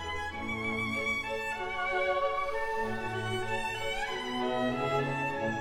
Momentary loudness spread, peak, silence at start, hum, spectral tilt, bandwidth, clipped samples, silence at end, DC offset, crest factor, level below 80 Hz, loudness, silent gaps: 4 LU; -18 dBFS; 0 s; none; -5 dB/octave; 17 kHz; under 0.1%; 0 s; 0.2%; 14 dB; -50 dBFS; -32 LUFS; none